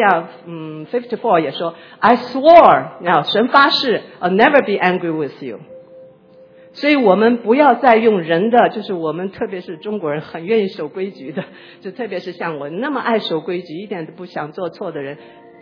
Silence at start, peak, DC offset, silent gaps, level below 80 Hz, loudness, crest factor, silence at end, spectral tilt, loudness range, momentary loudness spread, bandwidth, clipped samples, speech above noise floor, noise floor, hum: 0 s; 0 dBFS; under 0.1%; none; -58 dBFS; -15 LUFS; 16 dB; 0.45 s; -7 dB/octave; 11 LU; 17 LU; 5.4 kHz; 0.1%; 29 dB; -45 dBFS; none